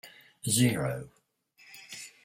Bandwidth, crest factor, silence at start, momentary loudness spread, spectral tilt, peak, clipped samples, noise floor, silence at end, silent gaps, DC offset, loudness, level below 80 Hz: 16 kHz; 20 dB; 0.05 s; 26 LU; -4 dB/octave; -12 dBFS; under 0.1%; -64 dBFS; 0.15 s; none; under 0.1%; -29 LUFS; -64 dBFS